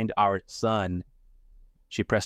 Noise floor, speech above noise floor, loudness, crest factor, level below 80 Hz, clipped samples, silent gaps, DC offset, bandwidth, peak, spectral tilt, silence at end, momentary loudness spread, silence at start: -55 dBFS; 29 dB; -28 LUFS; 18 dB; -54 dBFS; under 0.1%; none; under 0.1%; 12.5 kHz; -10 dBFS; -5.5 dB/octave; 0 s; 11 LU; 0 s